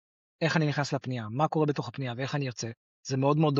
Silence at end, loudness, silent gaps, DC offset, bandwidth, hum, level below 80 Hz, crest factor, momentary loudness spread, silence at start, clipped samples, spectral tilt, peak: 0 s; -30 LUFS; 2.77-3.03 s; under 0.1%; 7.8 kHz; none; -70 dBFS; 18 dB; 9 LU; 0.4 s; under 0.1%; -5.5 dB/octave; -10 dBFS